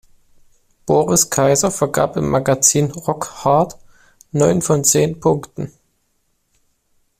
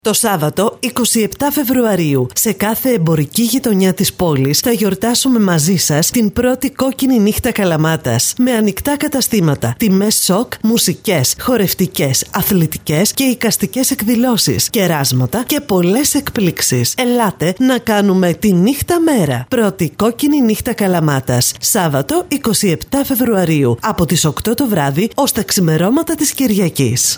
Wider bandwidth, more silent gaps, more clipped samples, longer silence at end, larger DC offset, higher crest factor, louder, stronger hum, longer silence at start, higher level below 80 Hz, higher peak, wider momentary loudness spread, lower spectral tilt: second, 16 kHz vs over 20 kHz; neither; neither; first, 1.5 s vs 0 s; neither; first, 18 dB vs 12 dB; second, -16 LUFS vs -13 LUFS; neither; first, 0.85 s vs 0.05 s; second, -48 dBFS vs -42 dBFS; about the same, 0 dBFS vs -2 dBFS; first, 11 LU vs 4 LU; about the same, -4.5 dB/octave vs -4.5 dB/octave